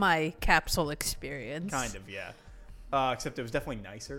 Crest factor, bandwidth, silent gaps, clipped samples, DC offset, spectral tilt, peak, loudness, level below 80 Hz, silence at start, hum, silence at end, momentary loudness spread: 22 dB; 17 kHz; none; under 0.1%; under 0.1%; -3.5 dB/octave; -10 dBFS; -31 LUFS; -42 dBFS; 0 s; none; 0 s; 15 LU